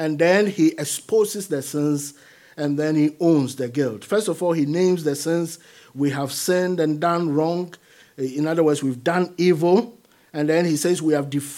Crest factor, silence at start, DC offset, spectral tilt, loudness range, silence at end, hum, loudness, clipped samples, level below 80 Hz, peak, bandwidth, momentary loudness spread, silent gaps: 18 dB; 0 s; under 0.1%; -5.5 dB/octave; 2 LU; 0 s; none; -21 LUFS; under 0.1%; -74 dBFS; -4 dBFS; 16.5 kHz; 9 LU; none